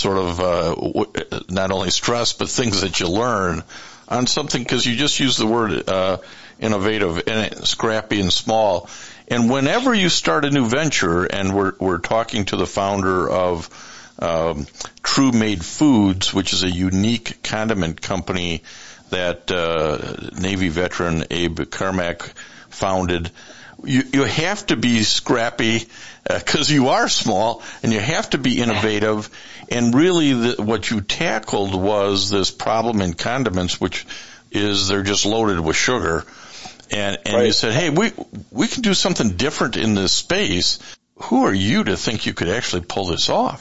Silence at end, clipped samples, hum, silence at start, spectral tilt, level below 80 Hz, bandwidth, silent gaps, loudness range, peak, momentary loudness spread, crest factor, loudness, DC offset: 0 s; under 0.1%; none; 0 s; -4 dB/octave; -46 dBFS; 8.2 kHz; none; 4 LU; -4 dBFS; 10 LU; 14 dB; -19 LUFS; 1%